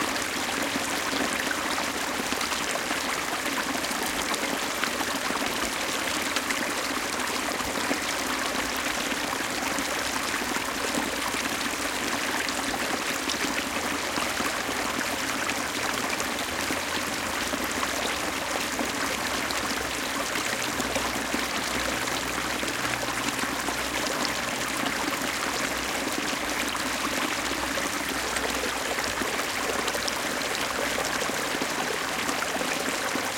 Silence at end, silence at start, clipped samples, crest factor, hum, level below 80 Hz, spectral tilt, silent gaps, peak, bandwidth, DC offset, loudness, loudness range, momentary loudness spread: 0 s; 0 s; under 0.1%; 24 dB; none; -52 dBFS; -1.5 dB/octave; none; -6 dBFS; 17 kHz; under 0.1%; -27 LUFS; 0 LU; 1 LU